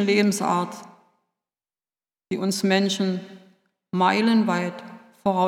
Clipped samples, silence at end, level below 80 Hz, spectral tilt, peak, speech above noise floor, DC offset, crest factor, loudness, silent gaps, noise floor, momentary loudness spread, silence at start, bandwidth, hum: under 0.1%; 0 s; -72 dBFS; -5 dB/octave; -4 dBFS; over 68 dB; under 0.1%; 20 dB; -23 LUFS; none; under -90 dBFS; 13 LU; 0 s; 16 kHz; none